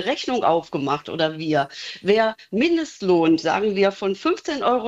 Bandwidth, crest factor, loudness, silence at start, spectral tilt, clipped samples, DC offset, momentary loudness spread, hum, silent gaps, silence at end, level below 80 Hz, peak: 8 kHz; 16 dB; -21 LUFS; 0 s; -5.5 dB/octave; under 0.1%; under 0.1%; 6 LU; none; none; 0 s; -60 dBFS; -4 dBFS